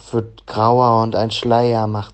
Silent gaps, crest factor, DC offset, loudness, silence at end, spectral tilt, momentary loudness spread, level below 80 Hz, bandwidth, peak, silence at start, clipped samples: none; 16 dB; under 0.1%; -16 LUFS; 0.05 s; -7 dB/octave; 10 LU; -50 dBFS; 8.6 kHz; -2 dBFS; 0.05 s; under 0.1%